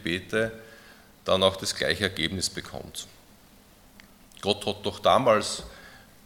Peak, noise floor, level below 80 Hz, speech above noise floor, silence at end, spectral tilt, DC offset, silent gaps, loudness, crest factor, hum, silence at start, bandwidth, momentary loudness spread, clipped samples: -4 dBFS; -55 dBFS; -56 dBFS; 28 dB; 0.25 s; -3.5 dB/octave; under 0.1%; none; -26 LUFS; 24 dB; none; 0 s; 18 kHz; 17 LU; under 0.1%